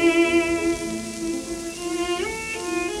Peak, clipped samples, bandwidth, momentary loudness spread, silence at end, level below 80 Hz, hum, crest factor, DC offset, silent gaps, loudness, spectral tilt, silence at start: -8 dBFS; under 0.1%; 13.5 kHz; 10 LU; 0 s; -46 dBFS; none; 16 dB; under 0.1%; none; -24 LUFS; -3.5 dB/octave; 0 s